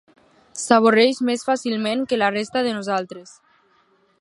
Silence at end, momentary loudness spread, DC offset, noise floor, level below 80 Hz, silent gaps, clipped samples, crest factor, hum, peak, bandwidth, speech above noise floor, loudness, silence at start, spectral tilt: 1 s; 16 LU; under 0.1%; -61 dBFS; -68 dBFS; none; under 0.1%; 22 dB; none; 0 dBFS; 11.5 kHz; 41 dB; -20 LUFS; 0.55 s; -4 dB/octave